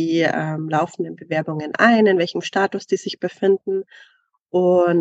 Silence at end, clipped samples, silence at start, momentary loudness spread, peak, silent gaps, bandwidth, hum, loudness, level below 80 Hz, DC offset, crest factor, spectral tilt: 0 s; under 0.1%; 0 s; 10 LU; -2 dBFS; 4.41-4.46 s; 8 kHz; none; -20 LUFS; -70 dBFS; under 0.1%; 18 dB; -6 dB/octave